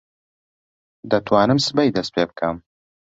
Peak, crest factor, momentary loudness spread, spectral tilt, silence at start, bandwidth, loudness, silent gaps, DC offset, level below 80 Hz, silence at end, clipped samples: -2 dBFS; 20 dB; 9 LU; -5.5 dB/octave; 1.05 s; 8.2 kHz; -19 LUFS; none; under 0.1%; -54 dBFS; 0.55 s; under 0.1%